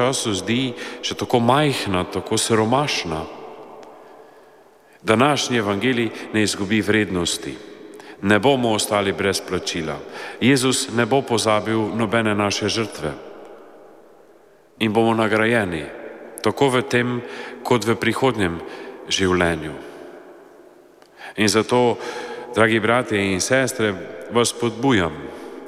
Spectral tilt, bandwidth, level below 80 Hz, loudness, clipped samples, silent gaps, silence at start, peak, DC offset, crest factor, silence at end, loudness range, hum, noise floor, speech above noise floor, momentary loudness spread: -4 dB/octave; 15.5 kHz; -52 dBFS; -20 LUFS; under 0.1%; none; 0 s; -2 dBFS; under 0.1%; 18 dB; 0 s; 4 LU; none; -51 dBFS; 32 dB; 17 LU